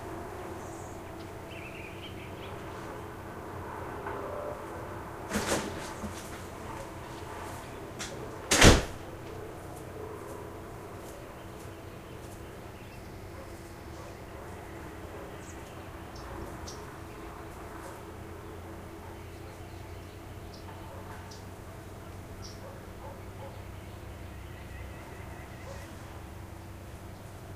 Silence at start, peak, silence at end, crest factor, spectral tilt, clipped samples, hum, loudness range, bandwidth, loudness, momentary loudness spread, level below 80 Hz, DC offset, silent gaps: 0 s; -4 dBFS; 0 s; 32 dB; -4 dB/octave; under 0.1%; none; 17 LU; 15.5 kHz; -36 LUFS; 7 LU; -44 dBFS; under 0.1%; none